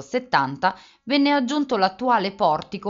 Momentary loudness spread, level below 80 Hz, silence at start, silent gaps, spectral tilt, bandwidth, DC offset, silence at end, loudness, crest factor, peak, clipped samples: 5 LU; -62 dBFS; 0 s; none; -2.5 dB/octave; 7.6 kHz; under 0.1%; 0 s; -21 LUFS; 18 dB; -4 dBFS; under 0.1%